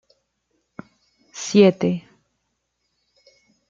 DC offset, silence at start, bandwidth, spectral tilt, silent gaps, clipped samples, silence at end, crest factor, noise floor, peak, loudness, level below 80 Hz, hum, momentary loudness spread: under 0.1%; 1.35 s; 7.6 kHz; -6 dB/octave; none; under 0.1%; 1.7 s; 22 dB; -74 dBFS; -2 dBFS; -19 LUFS; -68 dBFS; none; 18 LU